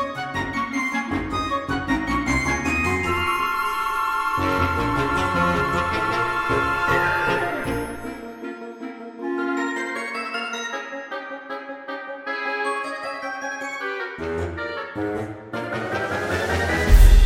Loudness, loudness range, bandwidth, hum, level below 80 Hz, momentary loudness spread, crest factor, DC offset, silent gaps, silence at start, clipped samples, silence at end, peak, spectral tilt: -24 LUFS; 7 LU; 16.5 kHz; none; -26 dBFS; 12 LU; 20 dB; under 0.1%; none; 0 s; under 0.1%; 0 s; -2 dBFS; -5 dB/octave